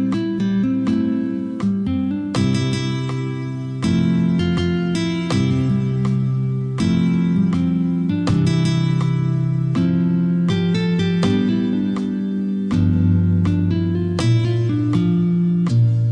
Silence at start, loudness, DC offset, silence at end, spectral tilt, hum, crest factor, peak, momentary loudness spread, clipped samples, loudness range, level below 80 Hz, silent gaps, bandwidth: 0 s; -19 LUFS; under 0.1%; 0 s; -7.5 dB/octave; none; 12 dB; -6 dBFS; 5 LU; under 0.1%; 2 LU; -46 dBFS; none; 10 kHz